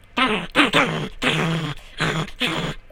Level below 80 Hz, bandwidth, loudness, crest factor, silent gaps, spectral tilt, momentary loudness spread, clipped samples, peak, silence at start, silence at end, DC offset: -42 dBFS; 16.5 kHz; -21 LUFS; 22 dB; none; -4.5 dB/octave; 9 LU; under 0.1%; 0 dBFS; 0.1 s; 0.05 s; under 0.1%